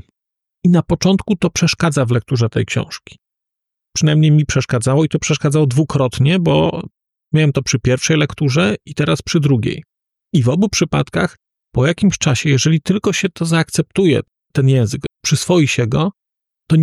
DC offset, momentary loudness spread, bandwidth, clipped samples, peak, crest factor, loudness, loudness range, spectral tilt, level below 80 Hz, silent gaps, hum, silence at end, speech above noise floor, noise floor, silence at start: under 0.1%; 6 LU; 12.5 kHz; under 0.1%; -4 dBFS; 12 dB; -16 LUFS; 2 LU; -5.5 dB/octave; -42 dBFS; none; none; 0 s; 68 dB; -82 dBFS; 0.65 s